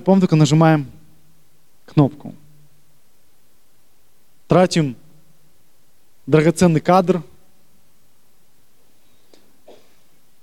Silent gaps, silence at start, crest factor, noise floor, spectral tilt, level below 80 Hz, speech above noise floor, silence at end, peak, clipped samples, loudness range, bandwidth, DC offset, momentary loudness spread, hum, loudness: none; 0.05 s; 20 dB; -61 dBFS; -7 dB/octave; -52 dBFS; 46 dB; 3.2 s; 0 dBFS; under 0.1%; 8 LU; 13 kHz; 0.7%; 23 LU; none; -16 LUFS